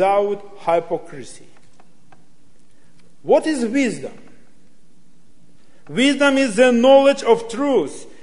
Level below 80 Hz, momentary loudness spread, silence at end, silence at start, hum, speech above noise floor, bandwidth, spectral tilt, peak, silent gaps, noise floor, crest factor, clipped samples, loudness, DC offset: -62 dBFS; 21 LU; 0.2 s; 0 s; none; 40 dB; 11 kHz; -4 dB/octave; 0 dBFS; none; -57 dBFS; 20 dB; under 0.1%; -17 LUFS; 2%